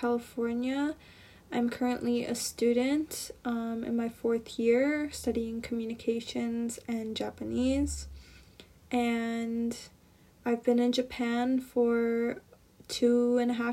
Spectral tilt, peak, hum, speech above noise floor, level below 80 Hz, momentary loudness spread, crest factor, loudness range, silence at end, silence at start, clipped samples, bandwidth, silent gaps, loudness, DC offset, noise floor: -4.5 dB/octave; -14 dBFS; none; 29 dB; -54 dBFS; 9 LU; 16 dB; 4 LU; 0 s; 0 s; under 0.1%; 15.5 kHz; none; -31 LUFS; under 0.1%; -59 dBFS